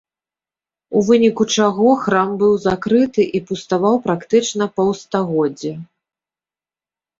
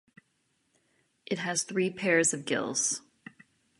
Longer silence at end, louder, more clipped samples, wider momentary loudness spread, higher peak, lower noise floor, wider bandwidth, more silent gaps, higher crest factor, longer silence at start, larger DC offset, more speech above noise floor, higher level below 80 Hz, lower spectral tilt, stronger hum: first, 1.35 s vs 0.8 s; first, -17 LUFS vs -29 LUFS; neither; about the same, 7 LU vs 9 LU; first, -2 dBFS vs -12 dBFS; first, under -90 dBFS vs -75 dBFS; second, 7.8 kHz vs 11.5 kHz; neither; second, 16 dB vs 22 dB; second, 0.9 s vs 1.3 s; neither; first, over 74 dB vs 46 dB; first, -56 dBFS vs -78 dBFS; first, -5 dB/octave vs -2.5 dB/octave; neither